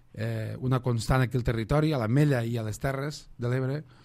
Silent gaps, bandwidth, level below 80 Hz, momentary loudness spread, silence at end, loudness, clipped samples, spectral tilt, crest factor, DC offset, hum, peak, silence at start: none; 15 kHz; -44 dBFS; 9 LU; 0.2 s; -28 LUFS; under 0.1%; -7 dB/octave; 16 dB; under 0.1%; none; -12 dBFS; 0.15 s